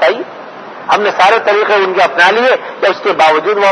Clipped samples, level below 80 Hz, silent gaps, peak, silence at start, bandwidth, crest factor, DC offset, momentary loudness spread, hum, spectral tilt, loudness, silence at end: 0.7%; -58 dBFS; none; 0 dBFS; 0 s; 11 kHz; 10 dB; under 0.1%; 16 LU; none; -3 dB/octave; -10 LUFS; 0 s